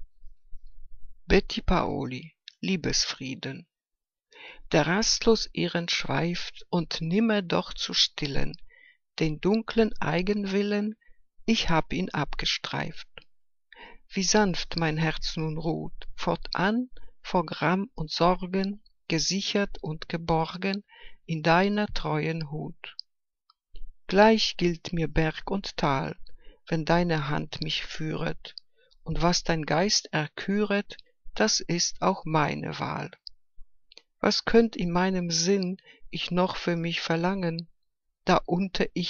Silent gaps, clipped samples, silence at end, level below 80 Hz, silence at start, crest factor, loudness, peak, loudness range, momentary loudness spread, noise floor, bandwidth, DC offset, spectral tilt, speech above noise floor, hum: none; under 0.1%; 0 s; -42 dBFS; 0 s; 22 dB; -27 LUFS; -4 dBFS; 3 LU; 14 LU; -86 dBFS; 7.4 kHz; under 0.1%; -4.5 dB/octave; 60 dB; none